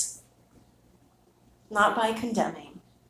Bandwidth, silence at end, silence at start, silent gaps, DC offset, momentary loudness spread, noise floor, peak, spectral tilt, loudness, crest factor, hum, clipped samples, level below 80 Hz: 16 kHz; 0.3 s; 0 s; none; under 0.1%; 23 LU; -62 dBFS; -10 dBFS; -3 dB/octave; -27 LUFS; 20 dB; 60 Hz at -55 dBFS; under 0.1%; -64 dBFS